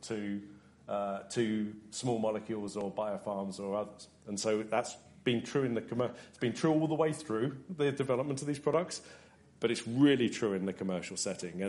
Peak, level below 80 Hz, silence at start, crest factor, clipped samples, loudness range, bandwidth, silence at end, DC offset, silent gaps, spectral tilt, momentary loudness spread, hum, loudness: -16 dBFS; -72 dBFS; 0 s; 18 dB; under 0.1%; 4 LU; 11.5 kHz; 0 s; under 0.1%; none; -5.5 dB/octave; 9 LU; none; -34 LUFS